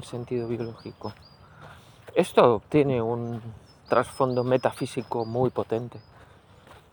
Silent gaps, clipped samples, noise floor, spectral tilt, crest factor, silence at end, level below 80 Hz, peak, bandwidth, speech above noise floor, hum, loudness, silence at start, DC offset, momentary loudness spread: none; under 0.1%; -53 dBFS; -7 dB/octave; 24 dB; 0.2 s; -60 dBFS; -4 dBFS; over 20 kHz; 27 dB; none; -26 LUFS; 0 s; under 0.1%; 18 LU